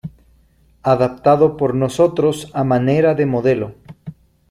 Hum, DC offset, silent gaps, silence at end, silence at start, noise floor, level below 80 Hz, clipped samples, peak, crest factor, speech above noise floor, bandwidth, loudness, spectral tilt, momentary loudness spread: none; under 0.1%; none; 0.4 s; 0.05 s; -54 dBFS; -50 dBFS; under 0.1%; -2 dBFS; 16 dB; 38 dB; 13 kHz; -16 LUFS; -7.5 dB/octave; 22 LU